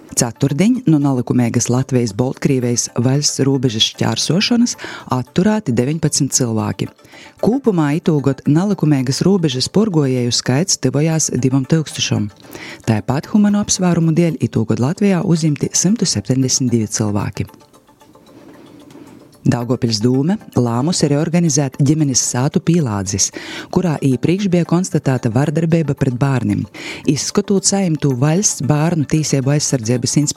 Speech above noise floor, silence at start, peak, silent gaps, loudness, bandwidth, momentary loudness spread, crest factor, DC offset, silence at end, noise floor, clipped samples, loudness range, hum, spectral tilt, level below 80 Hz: 31 dB; 0.1 s; 0 dBFS; none; -16 LUFS; 14.5 kHz; 5 LU; 16 dB; under 0.1%; 0.05 s; -46 dBFS; under 0.1%; 3 LU; none; -5 dB/octave; -50 dBFS